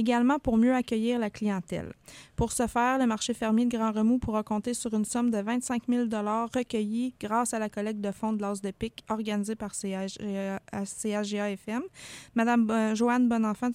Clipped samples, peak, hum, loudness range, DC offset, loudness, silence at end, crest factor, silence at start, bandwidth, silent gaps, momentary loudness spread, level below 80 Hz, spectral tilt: under 0.1%; -12 dBFS; none; 5 LU; under 0.1%; -29 LUFS; 0 s; 16 dB; 0 s; 15 kHz; none; 10 LU; -54 dBFS; -5 dB/octave